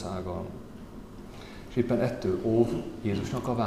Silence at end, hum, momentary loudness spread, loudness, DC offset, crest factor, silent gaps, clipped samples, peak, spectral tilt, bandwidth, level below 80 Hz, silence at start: 0 s; none; 19 LU; -29 LUFS; 0.1%; 20 dB; none; under 0.1%; -10 dBFS; -7.5 dB/octave; 14 kHz; -50 dBFS; 0 s